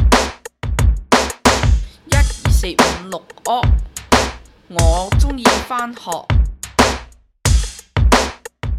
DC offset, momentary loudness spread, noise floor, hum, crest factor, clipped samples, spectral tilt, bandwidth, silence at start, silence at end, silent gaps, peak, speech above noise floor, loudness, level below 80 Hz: under 0.1%; 10 LU; -36 dBFS; none; 16 dB; under 0.1%; -4.5 dB/octave; 15 kHz; 0 s; 0 s; none; 0 dBFS; 20 dB; -17 LUFS; -20 dBFS